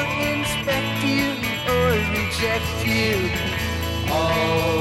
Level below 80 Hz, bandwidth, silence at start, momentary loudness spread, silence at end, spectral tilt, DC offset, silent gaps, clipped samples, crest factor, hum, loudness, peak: -36 dBFS; 17 kHz; 0 s; 4 LU; 0 s; -4.5 dB/octave; under 0.1%; none; under 0.1%; 14 dB; none; -21 LUFS; -8 dBFS